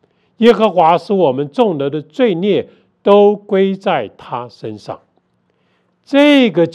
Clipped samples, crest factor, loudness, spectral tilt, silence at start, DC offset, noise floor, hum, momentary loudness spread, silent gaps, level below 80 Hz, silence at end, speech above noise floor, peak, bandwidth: 0.2%; 14 dB; -13 LUFS; -7 dB/octave; 0.4 s; under 0.1%; -61 dBFS; none; 17 LU; none; -62 dBFS; 0.05 s; 48 dB; 0 dBFS; 10 kHz